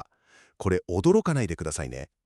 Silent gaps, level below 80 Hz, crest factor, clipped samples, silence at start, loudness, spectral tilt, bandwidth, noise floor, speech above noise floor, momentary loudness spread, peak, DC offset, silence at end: none; -46 dBFS; 16 dB; under 0.1%; 0.6 s; -26 LUFS; -6.5 dB/octave; 12.5 kHz; -60 dBFS; 35 dB; 11 LU; -10 dBFS; under 0.1%; 0.2 s